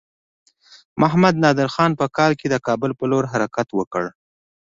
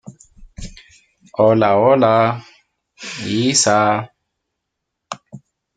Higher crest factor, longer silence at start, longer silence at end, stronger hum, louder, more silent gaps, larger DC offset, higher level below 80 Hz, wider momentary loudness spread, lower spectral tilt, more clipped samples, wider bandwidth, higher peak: about the same, 18 dB vs 16 dB; first, 0.95 s vs 0.05 s; first, 0.55 s vs 0.4 s; neither; second, -19 LUFS vs -15 LUFS; first, 3.87-3.91 s vs none; neither; second, -56 dBFS vs -48 dBFS; second, 9 LU vs 24 LU; first, -6.5 dB/octave vs -4 dB/octave; neither; second, 7.8 kHz vs 9.6 kHz; about the same, -2 dBFS vs -2 dBFS